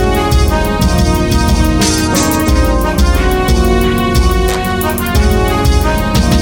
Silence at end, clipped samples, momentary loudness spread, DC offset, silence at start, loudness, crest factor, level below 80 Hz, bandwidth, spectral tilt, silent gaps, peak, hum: 0 s; under 0.1%; 2 LU; under 0.1%; 0 s; -12 LUFS; 10 dB; -14 dBFS; over 20 kHz; -5 dB/octave; none; 0 dBFS; none